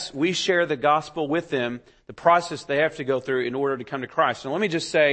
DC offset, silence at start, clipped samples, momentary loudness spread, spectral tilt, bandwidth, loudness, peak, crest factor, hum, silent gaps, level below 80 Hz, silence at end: under 0.1%; 0 s; under 0.1%; 7 LU; -4.5 dB/octave; 8.8 kHz; -24 LUFS; -4 dBFS; 20 dB; none; none; -62 dBFS; 0 s